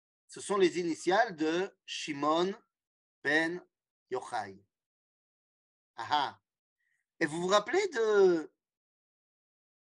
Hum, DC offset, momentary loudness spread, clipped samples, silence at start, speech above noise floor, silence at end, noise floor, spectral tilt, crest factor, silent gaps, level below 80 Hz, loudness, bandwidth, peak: none; under 0.1%; 16 LU; under 0.1%; 0.3 s; over 60 dB; 1.35 s; under -90 dBFS; -4 dB/octave; 20 dB; 2.87-3.22 s, 3.90-4.06 s, 4.86-5.94 s, 6.59-6.76 s; -84 dBFS; -31 LUFS; 11 kHz; -14 dBFS